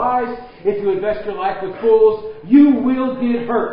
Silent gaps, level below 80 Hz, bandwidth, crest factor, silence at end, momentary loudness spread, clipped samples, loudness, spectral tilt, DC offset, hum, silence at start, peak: none; -50 dBFS; 5.2 kHz; 14 dB; 0 s; 11 LU; under 0.1%; -16 LUFS; -11.5 dB/octave; under 0.1%; none; 0 s; -2 dBFS